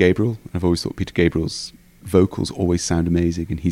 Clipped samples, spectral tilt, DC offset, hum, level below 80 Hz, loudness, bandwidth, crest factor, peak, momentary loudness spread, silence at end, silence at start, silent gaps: under 0.1%; -6 dB/octave; under 0.1%; none; -38 dBFS; -21 LUFS; 15 kHz; 18 dB; -2 dBFS; 6 LU; 0 s; 0 s; none